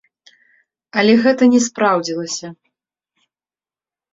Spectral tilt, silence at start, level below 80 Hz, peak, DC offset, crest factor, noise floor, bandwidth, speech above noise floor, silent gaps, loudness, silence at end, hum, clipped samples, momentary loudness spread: -4 dB/octave; 0.95 s; -62 dBFS; -2 dBFS; under 0.1%; 18 dB; under -90 dBFS; 7.8 kHz; over 75 dB; none; -15 LUFS; 1.6 s; none; under 0.1%; 13 LU